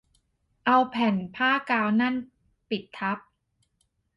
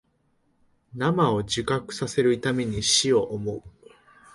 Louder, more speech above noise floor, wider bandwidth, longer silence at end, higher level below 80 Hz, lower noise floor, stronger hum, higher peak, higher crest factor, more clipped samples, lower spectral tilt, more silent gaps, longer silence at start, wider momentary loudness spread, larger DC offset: about the same, -26 LUFS vs -24 LUFS; first, 48 dB vs 44 dB; second, 6 kHz vs 11.5 kHz; first, 1 s vs 0.65 s; second, -68 dBFS vs -52 dBFS; first, -73 dBFS vs -68 dBFS; neither; about the same, -8 dBFS vs -8 dBFS; about the same, 18 dB vs 18 dB; neither; first, -7 dB/octave vs -4 dB/octave; neither; second, 0.65 s vs 0.95 s; about the same, 11 LU vs 12 LU; neither